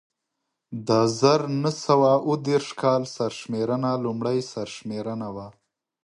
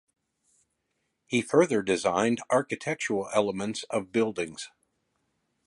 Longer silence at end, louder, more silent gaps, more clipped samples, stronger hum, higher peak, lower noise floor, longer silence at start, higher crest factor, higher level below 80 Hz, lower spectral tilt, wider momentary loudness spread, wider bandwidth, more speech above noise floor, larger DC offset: second, 0.55 s vs 1 s; first, -24 LUFS vs -27 LUFS; neither; neither; neither; first, -4 dBFS vs -8 dBFS; about the same, -81 dBFS vs -78 dBFS; second, 0.7 s vs 1.3 s; about the same, 20 dB vs 22 dB; about the same, -66 dBFS vs -68 dBFS; first, -6 dB/octave vs -4.5 dB/octave; first, 14 LU vs 10 LU; about the same, 11.5 kHz vs 11.5 kHz; first, 57 dB vs 51 dB; neither